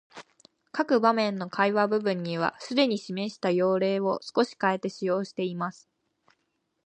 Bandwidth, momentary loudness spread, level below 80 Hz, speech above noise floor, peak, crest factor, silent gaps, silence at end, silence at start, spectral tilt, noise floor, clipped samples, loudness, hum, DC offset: 10 kHz; 8 LU; -78 dBFS; 51 dB; -8 dBFS; 20 dB; none; 1.15 s; 0.15 s; -6 dB/octave; -77 dBFS; under 0.1%; -27 LUFS; none; under 0.1%